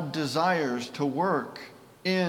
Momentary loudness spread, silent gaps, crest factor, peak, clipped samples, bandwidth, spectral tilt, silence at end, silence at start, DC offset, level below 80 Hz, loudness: 16 LU; none; 16 dB; -12 dBFS; under 0.1%; 17.5 kHz; -5.5 dB/octave; 0 s; 0 s; under 0.1%; -74 dBFS; -28 LUFS